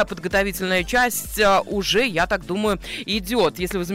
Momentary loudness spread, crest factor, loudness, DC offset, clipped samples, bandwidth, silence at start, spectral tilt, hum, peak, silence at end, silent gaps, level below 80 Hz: 6 LU; 12 dB; -21 LUFS; under 0.1%; under 0.1%; 16 kHz; 0 s; -3.5 dB/octave; none; -10 dBFS; 0 s; none; -38 dBFS